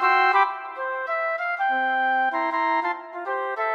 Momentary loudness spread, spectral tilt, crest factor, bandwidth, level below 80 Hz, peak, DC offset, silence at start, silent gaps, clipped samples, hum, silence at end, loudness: 10 LU; -2 dB/octave; 18 dB; 7 kHz; -90 dBFS; -6 dBFS; under 0.1%; 0 s; none; under 0.1%; none; 0 s; -23 LUFS